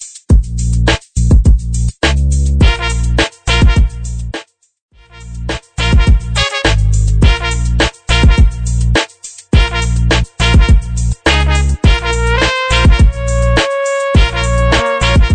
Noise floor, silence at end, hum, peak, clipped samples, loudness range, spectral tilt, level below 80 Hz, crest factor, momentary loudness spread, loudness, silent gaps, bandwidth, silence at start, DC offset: -31 dBFS; 0 s; none; 0 dBFS; under 0.1%; 4 LU; -5 dB/octave; -14 dBFS; 10 dB; 7 LU; -12 LUFS; 4.82-4.89 s; 9.4 kHz; 0 s; under 0.1%